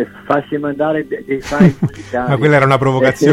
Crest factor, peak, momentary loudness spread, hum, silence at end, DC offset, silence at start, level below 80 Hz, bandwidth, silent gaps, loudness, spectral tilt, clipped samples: 14 dB; 0 dBFS; 10 LU; none; 0 s; under 0.1%; 0 s; -42 dBFS; 14 kHz; none; -14 LUFS; -7 dB/octave; under 0.1%